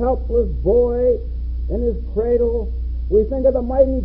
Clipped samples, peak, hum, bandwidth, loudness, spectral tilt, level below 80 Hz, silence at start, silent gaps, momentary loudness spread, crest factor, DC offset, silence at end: under 0.1%; -2 dBFS; none; 2.5 kHz; -19 LUFS; -14 dB/octave; -24 dBFS; 0 s; none; 9 LU; 16 dB; under 0.1%; 0 s